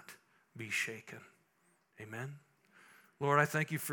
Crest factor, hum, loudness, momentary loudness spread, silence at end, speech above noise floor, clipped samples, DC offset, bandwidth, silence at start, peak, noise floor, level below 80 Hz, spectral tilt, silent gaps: 26 dB; none; -35 LUFS; 24 LU; 0 s; 38 dB; under 0.1%; under 0.1%; 18 kHz; 0.1 s; -14 dBFS; -74 dBFS; -88 dBFS; -4.5 dB/octave; none